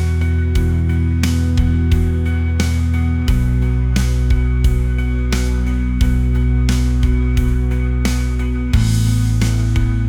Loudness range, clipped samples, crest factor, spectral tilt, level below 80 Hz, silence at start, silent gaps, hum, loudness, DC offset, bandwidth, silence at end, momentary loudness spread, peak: 1 LU; under 0.1%; 12 dB; -6.5 dB/octave; -18 dBFS; 0 s; none; none; -17 LUFS; under 0.1%; 15.5 kHz; 0 s; 3 LU; -2 dBFS